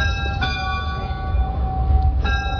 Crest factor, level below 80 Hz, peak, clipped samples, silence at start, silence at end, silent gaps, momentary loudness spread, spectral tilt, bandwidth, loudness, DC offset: 14 dB; -22 dBFS; -6 dBFS; under 0.1%; 0 s; 0 s; none; 5 LU; -6 dB/octave; 5.4 kHz; -22 LUFS; under 0.1%